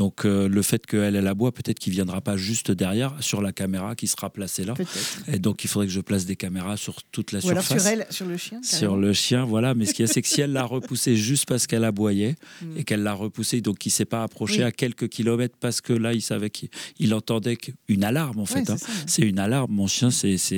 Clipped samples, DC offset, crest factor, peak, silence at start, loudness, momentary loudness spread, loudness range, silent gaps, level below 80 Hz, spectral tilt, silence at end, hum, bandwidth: under 0.1%; under 0.1%; 16 dB; -8 dBFS; 0 s; -24 LUFS; 8 LU; 4 LU; none; -62 dBFS; -4.5 dB/octave; 0 s; none; over 20 kHz